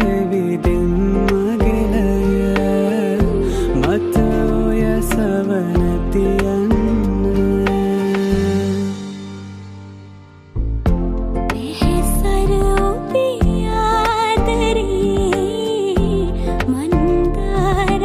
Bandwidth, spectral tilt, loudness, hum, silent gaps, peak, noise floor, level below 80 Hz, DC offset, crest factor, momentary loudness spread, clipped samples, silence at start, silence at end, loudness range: 15.5 kHz; -6.5 dB/octave; -17 LUFS; none; none; -2 dBFS; -39 dBFS; -22 dBFS; under 0.1%; 14 dB; 5 LU; under 0.1%; 0 s; 0 s; 5 LU